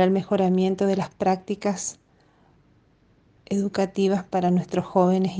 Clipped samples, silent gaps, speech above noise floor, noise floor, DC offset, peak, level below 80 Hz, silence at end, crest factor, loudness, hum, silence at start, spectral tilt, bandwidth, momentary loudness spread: under 0.1%; none; 37 dB; -60 dBFS; under 0.1%; -6 dBFS; -62 dBFS; 0 s; 18 dB; -24 LUFS; none; 0 s; -6.5 dB/octave; 9.8 kHz; 6 LU